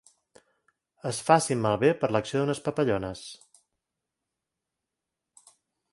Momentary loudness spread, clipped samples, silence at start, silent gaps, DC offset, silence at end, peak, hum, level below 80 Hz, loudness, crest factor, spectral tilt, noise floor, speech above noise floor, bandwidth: 15 LU; under 0.1%; 1.05 s; none; under 0.1%; 2.55 s; -4 dBFS; none; -62 dBFS; -26 LUFS; 26 dB; -5 dB/octave; -86 dBFS; 60 dB; 11.5 kHz